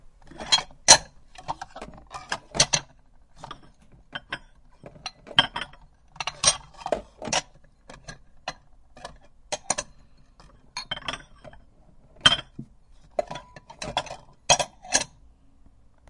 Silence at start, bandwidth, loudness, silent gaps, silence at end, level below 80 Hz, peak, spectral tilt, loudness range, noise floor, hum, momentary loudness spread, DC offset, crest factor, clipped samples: 0.3 s; 12 kHz; -23 LUFS; none; 1.05 s; -52 dBFS; 0 dBFS; 0 dB/octave; 12 LU; -54 dBFS; none; 24 LU; under 0.1%; 30 dB; under 0.1%